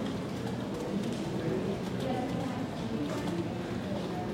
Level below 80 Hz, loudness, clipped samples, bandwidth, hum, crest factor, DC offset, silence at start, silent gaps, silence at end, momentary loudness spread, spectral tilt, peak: -56 dBFS; -34 LUFS; under 0.1%; 16.5 kHz; none; 14 dB; under 0.1%; 0 s; none; 0 s; 3 LU; -6.5 dB/octave; -20 dBFS